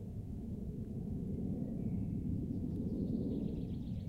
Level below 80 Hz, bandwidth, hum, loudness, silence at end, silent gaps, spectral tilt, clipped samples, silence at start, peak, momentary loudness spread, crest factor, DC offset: -50 dBFS; 12 kHz; none; -40 LUFS; 0 s; none; -10.5 dB/octave; under 0.1%; 0 s; -26 dBFS; 6 LU; 14 dB; under 0.1%